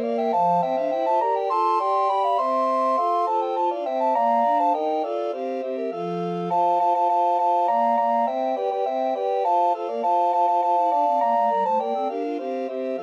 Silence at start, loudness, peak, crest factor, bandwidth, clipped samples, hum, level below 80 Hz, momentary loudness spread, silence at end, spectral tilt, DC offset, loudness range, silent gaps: 0 s; -22 LUFS; -12 dBFS; 10 dB; 8.4 kHz; under 0.1%; none; -86 dBFS; 7 LU; 0 s; -7 dB/octave; under 0.1%; 1 LU; none